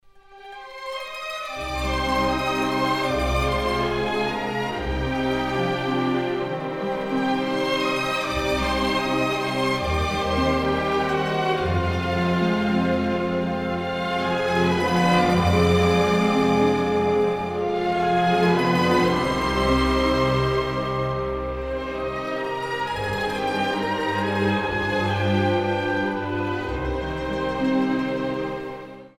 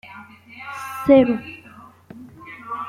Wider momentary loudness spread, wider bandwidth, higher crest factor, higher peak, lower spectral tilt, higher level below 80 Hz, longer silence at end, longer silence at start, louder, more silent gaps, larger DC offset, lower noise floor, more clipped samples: second, 8 LU vs 27 LU; about the same, 16 kHz vs 15 kHz; about the same, 16 dB vs 20 dB; second, -6 dBFS vs -2 dBFS; about the same, -6 dB/octave vs -6.5 dB/octave; first, -38 dBFS vs -56 dBFS; about the same, 0.1 s vs 0 s; first, 0.3 s vs 0.05 s; second, -23 LUFS vs -18 LUFS; neither; neither; about the same, -46 dBFS vs -46 dBFS; neither